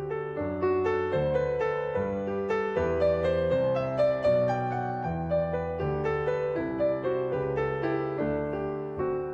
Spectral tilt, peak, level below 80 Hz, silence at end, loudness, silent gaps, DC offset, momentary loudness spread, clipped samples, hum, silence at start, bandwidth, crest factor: -8.5 dB/octave; -14 dBFS; -52 dBFS; 0 s; -28 LUFS; none; under 0.1%; 6 LU; under 0.1%; none; 0 s; 7.6 kHz; 14 dB